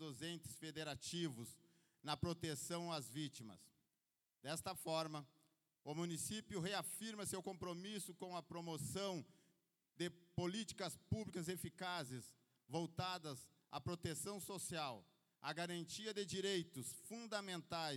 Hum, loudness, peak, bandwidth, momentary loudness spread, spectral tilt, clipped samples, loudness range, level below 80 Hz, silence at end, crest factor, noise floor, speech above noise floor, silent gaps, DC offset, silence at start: none; -47 LUFS; -28 dBFS; 18 kHz; 9 LU; -4 dB/octave; under 0.1%; 2 LU; -74 dBFS; 0 s; 20 dB; under -90 dBFS; over 43 dB; none; under 0.1%; 0 s